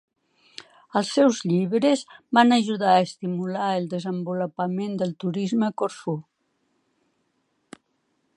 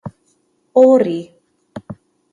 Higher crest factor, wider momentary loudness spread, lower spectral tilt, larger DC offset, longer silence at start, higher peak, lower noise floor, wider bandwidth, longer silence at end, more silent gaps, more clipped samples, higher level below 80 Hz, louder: about the same, 22 dB vs 18 dB; second, 12 LU vs 26 LU; second, -5.5 dB/octave vs -8 dB/octave; neither; first, 0.95 s vs 0.05 s; second, -4 dBFS vs 0 dBFS; first, -72 dBFS vs -62 dBFS; first, 11 kHz vs 7.4 kHz; first, 2.15 s vs 0.4 s; neither; neither; second, -76 dBFS vs -58 dBFS; second, -23 LUFS vs -14 LUFS